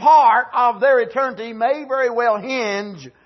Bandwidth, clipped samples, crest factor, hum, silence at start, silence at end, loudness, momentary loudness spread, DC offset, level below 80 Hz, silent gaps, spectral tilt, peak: 6.2 kHz; under 0.1%; 14 dB; none; 0 s; 0.15 s; -18 LUFS; 10 LU; under 0.1%; -72 dBFS; none; -4 dB/octave; -2 dBFS